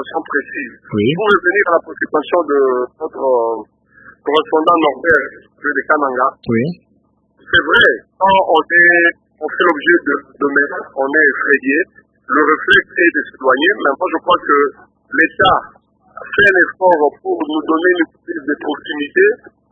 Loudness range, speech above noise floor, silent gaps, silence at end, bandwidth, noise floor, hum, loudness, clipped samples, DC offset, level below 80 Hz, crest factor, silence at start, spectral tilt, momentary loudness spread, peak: 3 LU; 44 dB; none; 0.35 s; 8 kHz; -58 dBFS; none; -14 LUFS; under 0.1%; under 0.1%; -52 dBFS; 14 dB; 0 s; -6.5 dB/octave; 11 LU; 0 dBFS